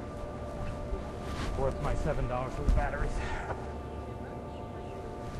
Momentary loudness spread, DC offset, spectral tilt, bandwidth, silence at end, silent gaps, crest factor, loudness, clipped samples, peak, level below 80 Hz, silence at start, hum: 9 LU; under 0.1%; -6.5 dB/octave; 12 kHz; 0 s; none; 20 dB; -36 LUFS; under 0.1%; -14 dBFS; -36 dBFS; 0 s; none